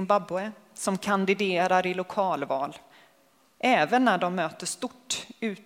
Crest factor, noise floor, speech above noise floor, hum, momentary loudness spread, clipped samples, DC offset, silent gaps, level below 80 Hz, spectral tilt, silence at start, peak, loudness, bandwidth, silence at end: 20 dB; -63 dBFS; 37 dB; none; 10 LU; under 0.1%; under 0.1%; none; -70 dBFS; -4 dB/octave; 0 s; -8 dBFS; -27 LUFS; 16 kHz; 0.05 s